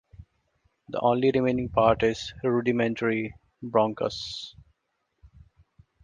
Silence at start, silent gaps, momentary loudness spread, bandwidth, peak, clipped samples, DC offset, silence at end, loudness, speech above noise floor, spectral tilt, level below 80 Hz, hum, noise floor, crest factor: 0.2 s; none; 14 LU; 9.4 kHz; -6 dBFS; under 0.1%; under 0.1%; 1.55 s; -26 LUFS; 52 dB; -6.5 dB/octave; -54 dBFS; none; -77 dBFS; 22 dB